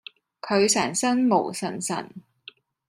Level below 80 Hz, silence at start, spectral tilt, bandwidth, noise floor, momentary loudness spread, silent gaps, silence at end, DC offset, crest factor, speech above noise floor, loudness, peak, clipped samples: -68 dBFS; 0.45 s; -3.5 dB/octave; 15 kHz; -50 dBFS; 20 LU; none; 0.7 s; under 0.1%; 18 dB; 27 dB; -23 LUFS; -8 dBFS; under 0.1%